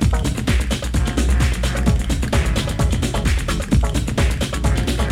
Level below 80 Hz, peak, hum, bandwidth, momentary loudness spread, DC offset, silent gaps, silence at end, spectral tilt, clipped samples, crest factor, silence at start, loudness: -20 dBFS; -4 dBFS; none; 15.5 kHz; 2 LU; under 0.1%; none; 0 s; -5.5 dB/octave; under 0.1%; 14 dB; 0 s; -20 LUFS